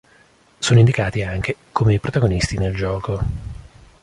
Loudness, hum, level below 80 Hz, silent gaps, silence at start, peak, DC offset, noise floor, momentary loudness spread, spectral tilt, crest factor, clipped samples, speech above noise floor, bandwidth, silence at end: -19 LUFS; none; -34 dBFS; none; 0.6 s; -2 dBFS; under 0.1%; -53 dBFS; 12 LU; -6 dB/octave; 18 dB; under 0.1%; 35 dB; 11.5 kHz; 0.4 s